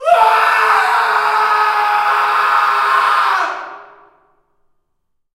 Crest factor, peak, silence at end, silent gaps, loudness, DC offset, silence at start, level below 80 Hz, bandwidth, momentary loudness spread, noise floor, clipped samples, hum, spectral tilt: 14 dB; 0 dBFS; 1.5 s; none; -13 LUFS; under 0.1%; 0 s; -64 dBFS; 16 kHz; 5 LU; -66 dBFS; under 0.1%; none; 0 dB/octave